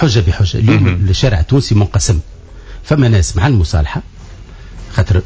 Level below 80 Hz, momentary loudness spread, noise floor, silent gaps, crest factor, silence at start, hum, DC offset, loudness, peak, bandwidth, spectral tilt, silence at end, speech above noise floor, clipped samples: -20 dBFS; 10 LU; -32 dBFS; none; 12 dB; 0 s; none; under 0.1%; -13 LUFS; 0 dBFS; 8 kHz; -6 dB/octave; 0 s; 21 dB; under 0.1%